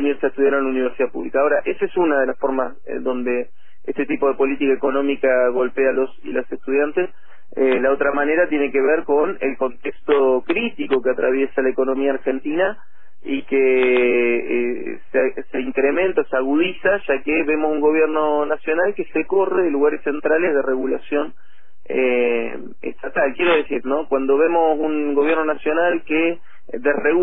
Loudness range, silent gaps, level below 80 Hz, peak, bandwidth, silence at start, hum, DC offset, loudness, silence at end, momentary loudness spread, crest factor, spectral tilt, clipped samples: 2 LU; none; -52 dBFS; -4 dBFS; 3.9 kHz; 0 s; none; 4%; -19 LUFS; 0 s; 9 LU; 16 dB; -9 dB/octave; under 0.1%